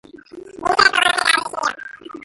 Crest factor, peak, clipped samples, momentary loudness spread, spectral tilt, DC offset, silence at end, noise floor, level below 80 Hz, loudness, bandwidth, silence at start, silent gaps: 20 dB; 0 dBFS; under 0.1%; 16 LU; -0.5 dB/octave; under 0.1%; 0 s; -39 dBFS; -54 dBFS; -16 LUFS; 12 kHz; 0.15 s; none